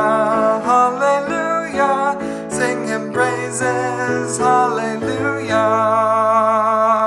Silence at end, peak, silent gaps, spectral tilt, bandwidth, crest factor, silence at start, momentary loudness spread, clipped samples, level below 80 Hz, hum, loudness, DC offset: 0 s; -2 dBFS; none; -4.5 dB/octave; 12.5 kHz; 14 dB; 0 s; 6 LU; under 0.1%; -56 dBFS; none; -17 LUFS; under 0.1%